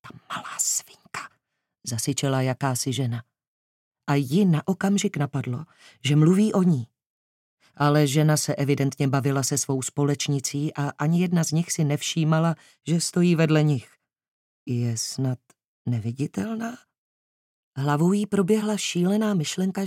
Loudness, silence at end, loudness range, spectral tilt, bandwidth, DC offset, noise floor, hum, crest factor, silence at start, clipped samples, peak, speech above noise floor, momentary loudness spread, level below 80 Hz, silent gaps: -24 LUFS; 0 s; 6 LU; -5.5 dB/octave; 16 kHz; under 0.1%; -77 dBFS; none; 16 dB; 0.05 s; under 0.1%; -8 dBFS; 54 dB; 14 LU; -74 dBFS; 3.48-3.91 s, 7.06-7.57 s, 14.28-14.66 s, 15.64-15.85 s, 16.98-17.72 s